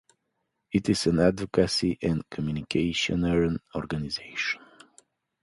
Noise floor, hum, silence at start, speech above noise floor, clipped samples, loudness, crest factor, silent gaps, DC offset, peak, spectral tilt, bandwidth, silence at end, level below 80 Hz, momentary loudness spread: -79 dBFS; none; 0.7 s; 52 dB; under 0.1%; -27 LUFS; 20 dB; none; under 0.1%; -8 dBFS; -5.5 dB/octave; 11.5 kHz; 0.85 s; -48 dBFS; 8 LU